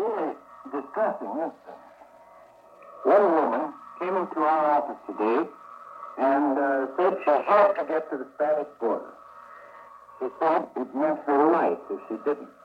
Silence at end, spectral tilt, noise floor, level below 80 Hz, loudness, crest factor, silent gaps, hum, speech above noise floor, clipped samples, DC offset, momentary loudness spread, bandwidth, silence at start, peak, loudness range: 0.15 s; -7.5 dB/octave; -52 dBFS; -78 dBFS; -25 LUFS; 18 dB; none; none; 27 dB; under 0.1%; under 0.1%; 15 LU; 5.8 kHz; 0 s; -8 dBFS; 4 LU